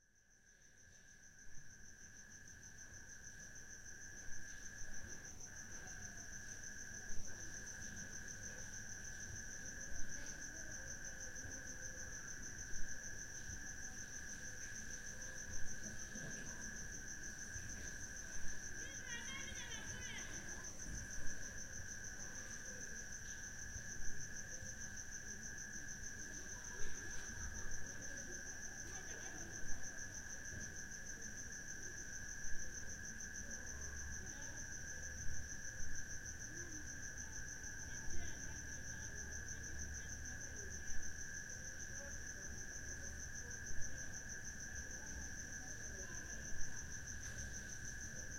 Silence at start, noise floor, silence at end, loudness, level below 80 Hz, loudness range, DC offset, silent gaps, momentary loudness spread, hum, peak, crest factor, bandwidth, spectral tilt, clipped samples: 0 s; -70 dBFS; 0 s; -49 LUFS; -56 dBFS; 3 LU; under 0.1%; none; 4 LU; none; -26 dBFS; 18 dB; 16.5 kHz; -2 dB/octave; under 0.1%